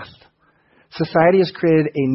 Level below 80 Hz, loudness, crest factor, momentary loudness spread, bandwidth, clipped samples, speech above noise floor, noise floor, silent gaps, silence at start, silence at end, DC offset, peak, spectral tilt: -58 dBFS; -17 LUFS; 16 dB; 11 LU; 5.8 kHz; under 0.1%; 43 dB; -59 dBFS; none; 0 s; 0 s; under 0.1%; -2 dBFS; -11 dB/octave